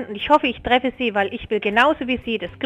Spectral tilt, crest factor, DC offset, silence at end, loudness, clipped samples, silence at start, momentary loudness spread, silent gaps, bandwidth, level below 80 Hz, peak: -5.5 dB/octave; 18 dB; under 0.1%; 0 s; -20 LUFS; under 0.1%; 0 s; 7 LU; none; 12 kHz; -46 dBFS; -2 dBFS